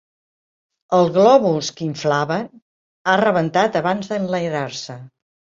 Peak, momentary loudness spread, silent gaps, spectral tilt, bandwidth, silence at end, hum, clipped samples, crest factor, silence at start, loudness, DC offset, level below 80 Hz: -2 dBFS; 14 LU; 2.62-3.05 s; -5.5 dB/octave; 7.8 kHz; 0.55 s; none; under 0.1%; 18 dB; 0.9 s; -18 LUFS; under 0.1%; -62 dBFS